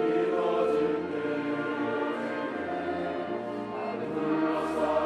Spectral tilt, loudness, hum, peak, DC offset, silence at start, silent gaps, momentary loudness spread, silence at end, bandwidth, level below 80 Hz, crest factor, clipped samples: -6.5 dB/octave; -30 LUFS; none; -16 dBFS; under 0.1%; 0 s; none; 7 LU; 0 s; 11 kHz; -68 dBFS; 14 dB; under 0.1%